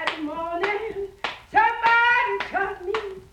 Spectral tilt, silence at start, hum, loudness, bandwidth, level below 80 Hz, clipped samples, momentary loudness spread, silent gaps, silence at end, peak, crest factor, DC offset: -3.5 dB/octave; 0 s; none; -23 LUFS; 11.5 kHz; -54 dBFS; under 0.1%; 13 LU; none; 0.1 s; -6 dBFS; 18 dB; under 0.1%